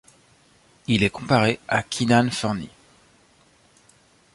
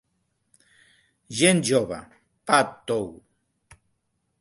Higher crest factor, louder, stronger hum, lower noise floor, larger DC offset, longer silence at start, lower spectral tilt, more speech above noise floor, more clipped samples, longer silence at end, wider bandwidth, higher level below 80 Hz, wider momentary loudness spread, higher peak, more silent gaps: about the same, 20 dB vs 24 dB; about the same, -22 LUFS vs -23 LUFS; neither; second, -58 dBFS vs -74 dBFS; neither; second, 0.9 s vs 1.3 s; about the same, -5 dB/octave vs -4 dB/octave; second, 36 dB vs 52 dB; neither; first, 1.65 s vs 1.25 s; about the same, 11.5 kHz vs 11.5 kHz; first, -52 dBFS vs -62 dBFS; second, 12 LU vs 18 LU; about the same, -4 dBFS vs -4 dBFS; neither